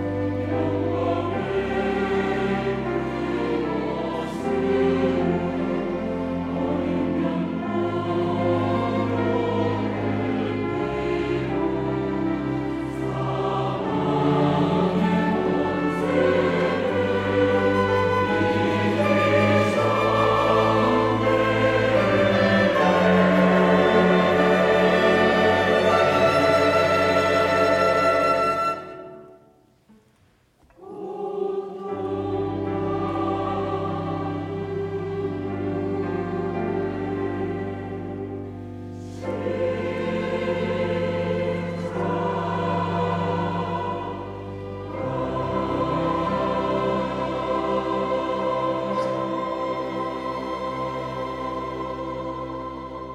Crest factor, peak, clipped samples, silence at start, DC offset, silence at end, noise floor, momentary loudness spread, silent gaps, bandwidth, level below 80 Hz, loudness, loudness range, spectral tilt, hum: 16 dB; -6 dBFS; under 0.1%; 0 s; under 0.1%; 0 s; -60 dBFS; 11 LU; none; 13 kHz; -48 dBFS; -23 LUFS; 10 LU; -7 dB/octave; none